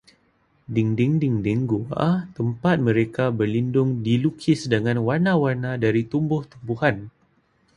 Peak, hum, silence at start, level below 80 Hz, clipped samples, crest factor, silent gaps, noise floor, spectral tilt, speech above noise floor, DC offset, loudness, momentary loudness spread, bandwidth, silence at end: -4 dBFS; none; 0.7 s; -54 dBFS; under 0.1%; 18 dB; none; -63 dBFS; -8 dB/octave; 42 dB; under 0.1%; -22 LUFS; 5 LU; 11 kHz; 0.65 s